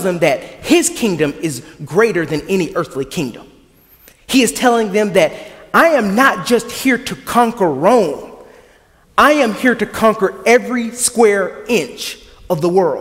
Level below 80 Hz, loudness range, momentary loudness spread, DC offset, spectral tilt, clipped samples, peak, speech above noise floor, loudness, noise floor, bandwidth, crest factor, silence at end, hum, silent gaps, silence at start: -48 dBFS; 4 LU; 11 LU; under 0.1%; -4 dB/octave; under 0.1%; 0 dBFS; 35 dB; -14 LUFS; -49 dBFS; 16.5 kHz; 16 dB; 0 s; none; none; 0 s